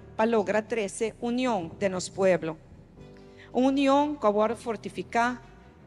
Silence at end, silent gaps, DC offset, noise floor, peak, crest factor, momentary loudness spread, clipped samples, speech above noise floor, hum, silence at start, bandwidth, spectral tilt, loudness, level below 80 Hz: 0.4 s; none; under 0.1%; -49 dBFS; -10 dBFS; 18 dB; 10 LU; under 0.1%; 23 dB; none; 0 s; 11.5 kHz; -5 dB/octave; -27 LUFS; -58 dBFS